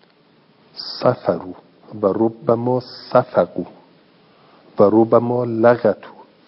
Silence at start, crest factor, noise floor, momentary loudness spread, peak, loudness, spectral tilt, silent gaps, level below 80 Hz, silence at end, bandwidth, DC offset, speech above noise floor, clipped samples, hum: 0.75 s; 20 dB; -54 dBFS; 18 LU; 0 dBFS; -18 LUFS; -11 dB/octave; none; -66 dBFS; 0.25 s; 5.8 kHz; under 0.1%; 37 dB; under 0.1%; none